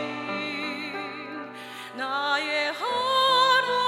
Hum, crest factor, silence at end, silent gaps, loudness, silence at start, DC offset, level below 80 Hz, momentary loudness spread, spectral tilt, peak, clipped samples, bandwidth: none; 16 dB; 0 s; none; -25 LUFS; 0 s; under 0.1%; -86 dBFS; 18 LU; -2.5 dB/octave; -10 dBFS; under 0.1%; 16 kHz